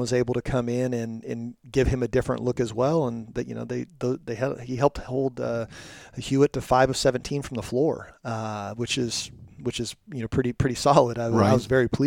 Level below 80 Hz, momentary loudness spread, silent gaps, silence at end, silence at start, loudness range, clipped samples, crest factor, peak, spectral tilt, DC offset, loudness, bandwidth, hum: -44 dBFS; 13 LU; none; 0 s; 0 s; 4 LU; under 0.1%; 24 dB; -2 dBFS; -5.5 dB/octave; under 0.1%; -26 LUFS; 16.5 kHz; none